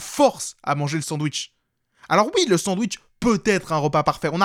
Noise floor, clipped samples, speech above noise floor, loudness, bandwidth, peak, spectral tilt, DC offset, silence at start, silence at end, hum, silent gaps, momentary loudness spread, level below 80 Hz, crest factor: -60 dBFS; under 0.1%; 39 dB; -22 LUFS; 16.5 kHz; -4 dBFS; -4.5 dB/octave; under 0.1%; 0 s; 0 s; none; none; 8 LU; -52 dBFS; 18 dB